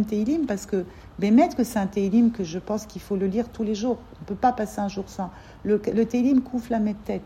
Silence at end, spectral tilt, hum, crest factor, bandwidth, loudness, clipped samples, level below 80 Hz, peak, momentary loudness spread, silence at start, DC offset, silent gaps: 0 s; -6.5 dB/octave; none; 16 dB; 15.5 kHz; -24 LUFS; under 0.1%; -50 dBFS; -8 dBFS; 12 LU; 0 s; under 0.1%; none